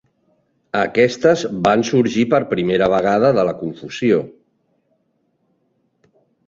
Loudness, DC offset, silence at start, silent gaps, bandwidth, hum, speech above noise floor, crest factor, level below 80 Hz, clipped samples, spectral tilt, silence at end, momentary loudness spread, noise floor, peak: -17 LUFS; under 0.1%; 0.75 s; none; 7.8 kHz; none; 50 dB; 18 dB; -54 dBFS; under 0.1%; -6 dB/octave; 2.2 s; 8 LU; -66 dBFS; -2 dBFS